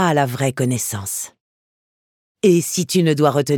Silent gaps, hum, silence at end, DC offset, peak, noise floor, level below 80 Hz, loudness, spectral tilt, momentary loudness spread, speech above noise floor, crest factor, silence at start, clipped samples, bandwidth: 1.40-2.35 s; none; 0 s; under 0.1%; -2 dBFS; under -90 dBFS; -64 dBFS; -18 LUFS; -5 dB/octave; 9 LU; over 73 dB; 18 dB; 0 s; under 0.1%; 19 kHz